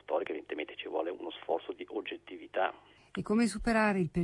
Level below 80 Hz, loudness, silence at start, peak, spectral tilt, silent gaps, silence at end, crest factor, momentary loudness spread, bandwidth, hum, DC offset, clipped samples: -54 dBFS; -34 LUFS; 0.1 s; -16 dBFS; -6 dB/octave; none; 0 s; 18 dB; 13 LU; 11.5 kHz; 50 Hz at -70 dBFS; under 0.1%; under 0.1%